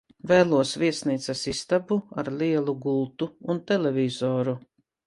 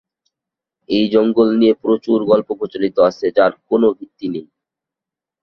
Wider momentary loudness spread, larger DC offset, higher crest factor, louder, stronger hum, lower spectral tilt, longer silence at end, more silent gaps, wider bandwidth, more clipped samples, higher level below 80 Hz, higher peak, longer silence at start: second, 9 LU vs 12 LU; neither; about the same, 20 dB vs 16 dB; second, -25 LUFS vs -16 LUFS; neither; second, -5.5 dB/octave vs -7.5 dB/octave; second, 0.45 s vs 1 s; neither; first, 11.5 kHz vs 6.4 kHz; neither; about the same, -60 dBFS vs -58 dBFS; second, -6 dBFS vs -2 dBFS; second, 0.25 s vs 0.9 s